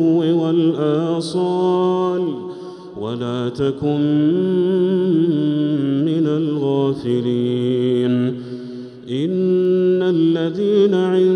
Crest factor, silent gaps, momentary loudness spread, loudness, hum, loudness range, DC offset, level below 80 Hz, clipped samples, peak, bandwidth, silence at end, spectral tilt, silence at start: 12 dB; none; 11 LU; -18 LUFS; none; 2 LU; under 0.1%; -60 dBFS; under 0.1%; -4 dBFS; 10 kHz; 0 s; -8.5 dB/octave; 0 s